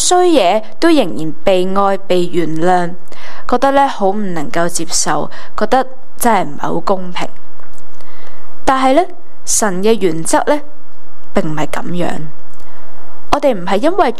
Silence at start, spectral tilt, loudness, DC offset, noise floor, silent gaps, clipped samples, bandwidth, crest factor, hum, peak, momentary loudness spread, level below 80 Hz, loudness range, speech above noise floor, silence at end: 0 s; -4 dB/octave; -15 LUFS; 30%; -40 dBFS; none; under 0.1%; 15.5 kHz; 16 dB; none; 0 dBFS; 12 LU; -38 dBFS; 4 LU; 27 dB; 0 s